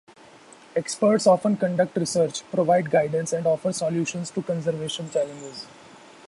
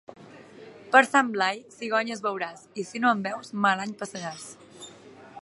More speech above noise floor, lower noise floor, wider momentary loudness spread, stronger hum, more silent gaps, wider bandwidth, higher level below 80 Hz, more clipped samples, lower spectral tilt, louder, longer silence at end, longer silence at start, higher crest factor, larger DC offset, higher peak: about the same, 26 dB vs 23 dB; about the same, -49 dBFS vs -49 dBFS; second, 11 LU vs 23 LU; neither; neither; about the same, 11.5 kHz vs 11.5 kHz; first, -66 dBFS vs -78 dBFS; neither; first, -5 dB/octave vs -3.5 dB/octave; about the same, -24 LUFS vs -25 LUFS; first, 0.6 s vs 0.05 s; first, 0.75 s vs 0.1 s; second, 18 dB vs 24 dB; neither; about the same, -6 dBFS vs -4 dBFS